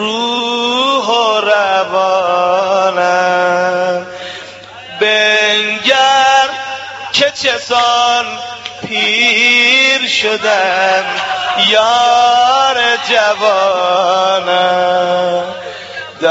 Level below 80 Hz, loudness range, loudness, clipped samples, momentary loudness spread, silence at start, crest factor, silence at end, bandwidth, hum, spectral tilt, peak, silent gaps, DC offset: -58 dBFS; 3 LU; -11 LUFS; under 0.1%; 14 LU; 0 s; 12 dB; 0 s; 8 kHz; none; 1 dB/octave; 0 dBFS; none; under 0.1%